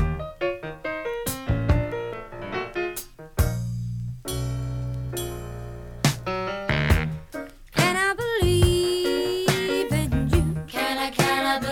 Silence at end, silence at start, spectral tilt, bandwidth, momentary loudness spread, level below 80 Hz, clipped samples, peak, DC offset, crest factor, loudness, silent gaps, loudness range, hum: 0 s; 0 s; -5 dB/octave; 19.5 kHz; 12 LU; -34 dBFS; under 0.1%; -6 dBFS; under 0.1%; 20 dB; -25 LUFS; none; 7 LU; none